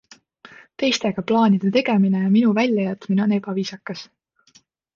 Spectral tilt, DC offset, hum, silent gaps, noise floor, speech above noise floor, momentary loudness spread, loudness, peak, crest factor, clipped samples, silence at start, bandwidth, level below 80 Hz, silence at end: -6 dB/octave; under 0.1%; none; none; -57 dBFS; 38 dB; 11 LU; -20 LUFS; -4 dBFS; 16 dB; under 0.1%; 0.8 s; 7.4 kHz; -66 dBFS; 0.9 s